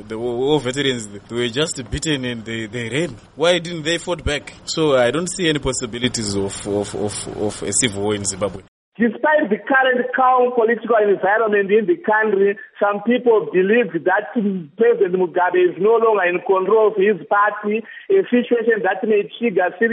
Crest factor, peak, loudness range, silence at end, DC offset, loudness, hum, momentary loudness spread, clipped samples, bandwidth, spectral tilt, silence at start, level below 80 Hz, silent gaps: 18 dB; 0 dBFS; 5 LU; 0 s; under 0.1%; -18 LUFS; none; 8 LU; under 0.1%; 11.5 kHz; -4 dB/octave; 0 s; -44 dBFS; 8.68-8.92 s